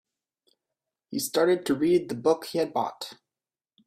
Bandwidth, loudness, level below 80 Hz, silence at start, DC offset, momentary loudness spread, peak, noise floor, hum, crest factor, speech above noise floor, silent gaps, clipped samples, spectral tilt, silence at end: 16 kHz; -26 LUFS; -68 dBFS; 1.1 s; under 0.1%; 12 LU; -10 dBFS; under -90 dBFS; none; 18 dB; over 64 dB; none; under 0.1%; -4.5 dB/octave; 0.75 s